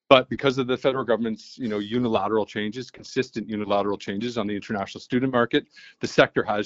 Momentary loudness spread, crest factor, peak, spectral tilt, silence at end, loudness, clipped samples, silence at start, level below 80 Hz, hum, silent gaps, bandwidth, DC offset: 10 LU; 24 dB; 0 dBFS; -5.5 dB/octave; 0 s; -25 LUFS; under 0.1%; 0.1 s; -58 dBFS; none; none; 8 kHz; under 0.1%